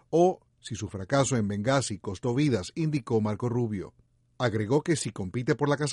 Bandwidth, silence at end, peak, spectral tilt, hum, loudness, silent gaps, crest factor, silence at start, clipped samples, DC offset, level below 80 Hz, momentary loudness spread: 11.5 kHz; 0 s; -12 dBFS; -6 dB/octave; none; -28 LUFS; none; 16 dB; 0.1 s; under 0.1%; under 0.1%; -60 dBFS; 11 LU